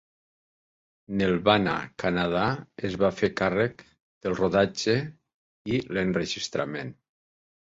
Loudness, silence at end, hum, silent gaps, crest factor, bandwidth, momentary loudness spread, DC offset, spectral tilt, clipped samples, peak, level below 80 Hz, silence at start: -26 LUFS; 0.8 s; none; 4.02-4.21 s, 5.34-5.65 s; 22 dB; 8 kHz; 10 LU; under 0.1%; -5.5 dB/octave; under 0.1%; -6 dBFS; -54 dBFS; 1.1 s